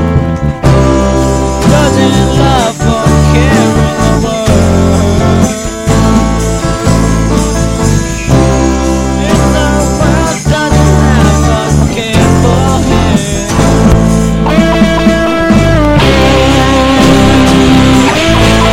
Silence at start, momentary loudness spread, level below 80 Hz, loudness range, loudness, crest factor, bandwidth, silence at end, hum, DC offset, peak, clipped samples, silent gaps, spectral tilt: 0 s; 5 LU; -16 dBFS; 3 LU; -8 LUFS; 8 dB; 16.5 kHz; 0 s; none; 1%; 0 dBFS; 0.9%; none; -5.5 dB/octave